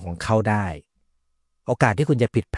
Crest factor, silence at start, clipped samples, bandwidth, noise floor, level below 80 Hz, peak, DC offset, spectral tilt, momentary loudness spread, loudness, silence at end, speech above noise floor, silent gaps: 20 dB; 0 s; under 0.1%; 11.5 kHz; -70 dBFS; -48 dBFS; -4 dBFS; under 0.1%; -7 dB/octave; 13 LU; -22 LUFS; 0 s; 48 dB; none